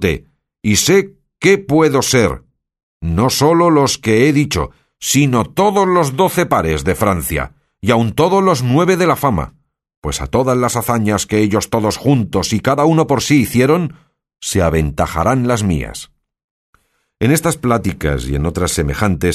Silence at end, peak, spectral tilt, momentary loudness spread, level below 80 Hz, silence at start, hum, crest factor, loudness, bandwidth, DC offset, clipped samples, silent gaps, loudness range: 0 s; 0 dBFS; -5 dB/octave; 10 LU; -32 dBFS; 0 s; none; 14 dB; -14 LUFS; 13.5 kHz; under 0.1%; under 0.1%; 2.83-3.00 s, 9.97-10.02 s, 16.44-16.73 s; 4 LU